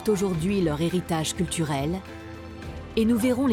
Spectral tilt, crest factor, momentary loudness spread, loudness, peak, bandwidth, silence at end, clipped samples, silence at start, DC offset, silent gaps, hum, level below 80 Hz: -5.5 dB/octave; 14 dB; 16 LU; -25 LUFS; -12 dBFS; 17.5 kHz; 0 s; under 0.1%; 0 s; under 0.1%; none; none; -46 dBFS